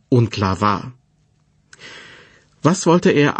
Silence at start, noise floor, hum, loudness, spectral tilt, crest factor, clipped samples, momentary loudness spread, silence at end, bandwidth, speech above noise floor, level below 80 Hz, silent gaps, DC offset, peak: 0.1 s; -60 dBFS; none; -17 LUFS; -6 dB/octave; 18 dB; under 0.1%; 23 LU; 0 s; 8.8 kHz; 44 dB; -54 dBFS; none; under 0.1%; -2 dBFS